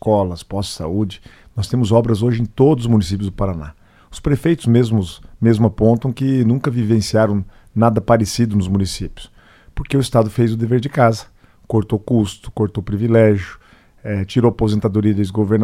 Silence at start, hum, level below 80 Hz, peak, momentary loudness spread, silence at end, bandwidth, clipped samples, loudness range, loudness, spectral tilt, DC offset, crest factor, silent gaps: 0.05 s; none; -38 dBFS; 0 dBFS; 11 LU; 0 s; 14 kHz; under 0.1%; 2 LU; -17 LUFS; -7.5 dB/octave; under 0.1%; 16 dB; none